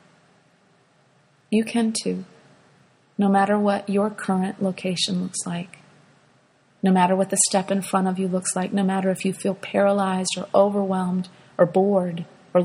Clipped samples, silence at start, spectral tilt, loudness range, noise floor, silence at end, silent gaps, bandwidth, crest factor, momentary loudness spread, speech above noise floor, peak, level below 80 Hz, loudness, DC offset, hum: under 0.1%; 1.5 s; -5 dB/octave; 4 LU; -60 dBFS; 0 s; none; 14 kHz; 20 dB; 10 LU; 38 dB; -4 dBFS; -68 dBFS; -22 LUFS; under 0.1%; none